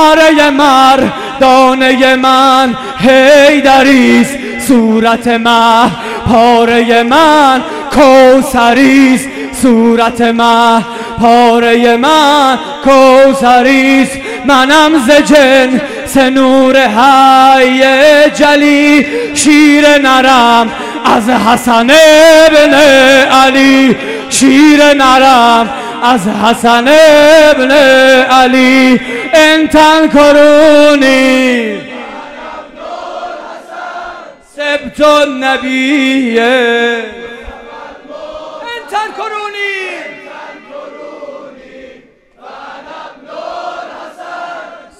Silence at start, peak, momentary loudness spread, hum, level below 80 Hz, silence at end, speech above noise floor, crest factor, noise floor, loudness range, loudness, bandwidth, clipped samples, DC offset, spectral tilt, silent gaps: 0 s; 0 dBFS; 19 LU; none; -38 dBFS; 0.25 s; 36 dB; 6 dB; -41 dBFS; 15 LU; -6 LUFS; 16.5 kHz; 4%; under 0.1%; -3.5 dB/octave; none